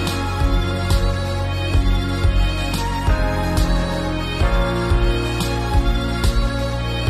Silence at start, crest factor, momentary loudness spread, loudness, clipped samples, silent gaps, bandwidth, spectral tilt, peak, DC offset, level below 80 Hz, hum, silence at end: 0 s; 12 dB; 3 LU; -20 LUFS; under 0.1%; none; 14 kHz; -5.5 dB/octave; -6 dBFS; under 0.1%; -20 dBFS; none; 0 s